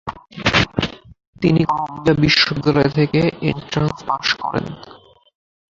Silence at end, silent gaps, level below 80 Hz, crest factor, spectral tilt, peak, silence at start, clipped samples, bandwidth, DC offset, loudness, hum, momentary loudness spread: 0.85 s; 1.27-1.33 s; -42 dBFS; 18 dB; -5.5 dB/octave; -2 dBFS; 0.05 s; under 0.1%; 7.6 kHz; under 0.1%; -18 LUFS; none; 11 LU